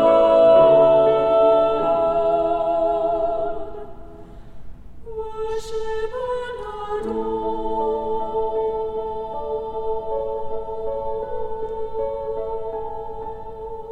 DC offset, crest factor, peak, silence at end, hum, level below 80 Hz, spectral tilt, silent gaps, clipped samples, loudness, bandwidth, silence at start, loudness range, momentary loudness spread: under 0.1%; 18 dB; -4 dBFS; 0 s; none; -42 dBFS; -6.5 dB/octave; none; under 0.1%; -21 LUFS; 8.4 kHz; 0 s; 12 LU; 18 LU